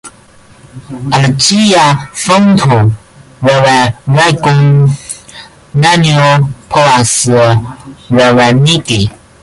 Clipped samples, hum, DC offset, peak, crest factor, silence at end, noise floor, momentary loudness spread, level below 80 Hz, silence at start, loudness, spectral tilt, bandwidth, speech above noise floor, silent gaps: under 0.1%; none; under 0.1%; 0 dBFS; 10 dB; 0.3 s; -40 dBFS; 11 LU; -38 dBFS; 0.05 s; -8 LUFS; -5 dB/octave; 11.5 kHz; 32 dB; none